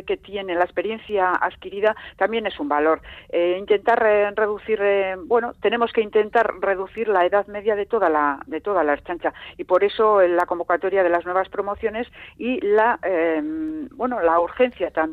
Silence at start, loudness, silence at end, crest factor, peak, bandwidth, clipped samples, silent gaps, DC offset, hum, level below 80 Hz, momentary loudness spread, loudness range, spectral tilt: 0.05 s; -21 LUFS; 0 s; 14 dB; -6 dBFS; 4.7 kHz; under 0.1%; none; under 0.1%; none; -54 dBFS; 9 LU; 2 LU; -6.5 dB/octave